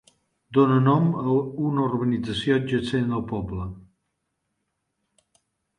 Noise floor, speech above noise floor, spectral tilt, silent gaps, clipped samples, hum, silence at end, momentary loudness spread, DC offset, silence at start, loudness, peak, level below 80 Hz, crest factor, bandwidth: -78 dBFS; 55 dB; -8 dB/octave; none; under 0.1%; none; 2 s; 11 LU; under 0.1%; 0.5 s; -23 LUFS; -6 dBFS; -50 dBFS; 18 dB; 10.5 kHz